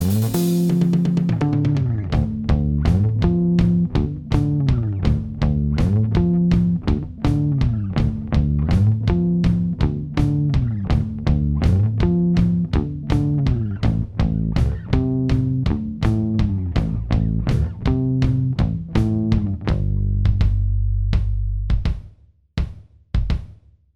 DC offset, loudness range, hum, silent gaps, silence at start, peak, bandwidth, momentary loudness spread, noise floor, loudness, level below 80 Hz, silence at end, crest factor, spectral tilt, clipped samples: under 0.1%; 2 LU; none; none; 0 s; -4 dBFS; 16 kHz; 5 LU; -50 dBFS; -20 LUFS; -26 dBFS; 0.45 s; 16 dB; -8.5 dB/octave; under 0.1%